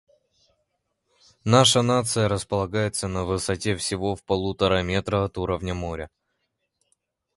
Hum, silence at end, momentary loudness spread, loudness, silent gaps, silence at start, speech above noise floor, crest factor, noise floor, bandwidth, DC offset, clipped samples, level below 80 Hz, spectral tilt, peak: none; 1.3 s; 12 LU; -23 LUFS; none; 1.45 s; 53 dB; 24 dB; -76 dBFS; 11.5 kHz; under 0.1%; under 0.1%; -44 dBFS; -4.5 dB/octave; -2 dBFS